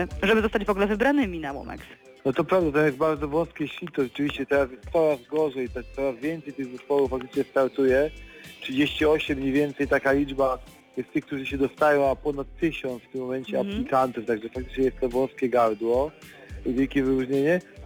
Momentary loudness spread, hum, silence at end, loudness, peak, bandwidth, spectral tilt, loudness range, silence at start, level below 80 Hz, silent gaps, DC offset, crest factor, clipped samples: 11 LU; none; 0 s; -25 LUFS; -10 dBFS; over 20 kHz; -6.5 dB/octave; 2 LU; 0 s; -46 dBFS; none; under 0.1%; 16 dB; under 0.1%